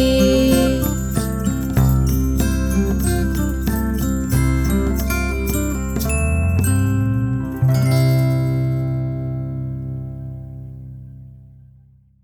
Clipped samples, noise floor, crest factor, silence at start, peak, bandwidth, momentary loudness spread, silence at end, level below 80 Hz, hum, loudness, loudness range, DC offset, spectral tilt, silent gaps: under 0.1%; -50 dBFS; 16 dB; 0 s; -2 dBFS; over 20 kHz; 13 LU; 0.8 s; -24 dBFS; none; -19 LUFS; 6 LU; under 0.1%; -6.5 dB/octave; none